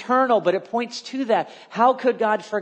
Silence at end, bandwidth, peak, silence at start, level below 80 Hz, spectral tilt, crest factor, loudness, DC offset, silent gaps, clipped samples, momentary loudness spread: 0 s; 9 kHz; -4 dBFS; 0 s; -78 dBFS; -5 dB/octave; 16 dB; -21 LUFS; under 0.1%; none; under 0.1%; 9 LU